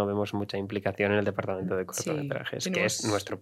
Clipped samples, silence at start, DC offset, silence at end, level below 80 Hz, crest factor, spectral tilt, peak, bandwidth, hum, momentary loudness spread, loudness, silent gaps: under 0.1%; 0 s; under 0.1%; 0 s; -68 dBFS; 18 dB; -4.5 dB/octave; -12 dBFS; 15.5 kHz; none; 6 LU; -30 LUFS; none